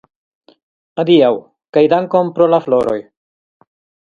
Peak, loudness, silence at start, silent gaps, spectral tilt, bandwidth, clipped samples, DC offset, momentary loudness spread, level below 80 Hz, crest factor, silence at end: 0 dBFS; -14 LUFS; 0.95 s; 1.69-1.73 s; -8 dB/octave; 7 kHz; under 0.1%; under 0.1%; 12 LU; -58 dBFS; 16 dB; 1.05 s